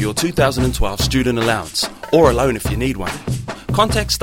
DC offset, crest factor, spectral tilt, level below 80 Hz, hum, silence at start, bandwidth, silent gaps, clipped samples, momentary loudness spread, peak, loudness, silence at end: under 0.1%; 18 dB; -4.5 dB/octave; -28 dBFS; none; 0 s; 16.5 kHz; none; under 0.1%; 10 LU; 0 dBFS; -17 LUFS; 0 s